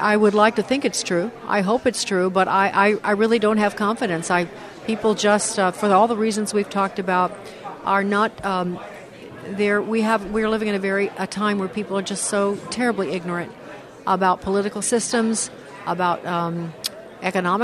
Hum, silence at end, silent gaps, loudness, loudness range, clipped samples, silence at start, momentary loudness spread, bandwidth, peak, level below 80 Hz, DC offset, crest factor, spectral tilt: none; 0 s; none; -21 LUFS; 4 LU; under 0.1%; 0 s; 11 LU; 13.5 kHz; -2 dBFS; -56 dBFS; under 0.1%; 20 dB; -4 dB/octave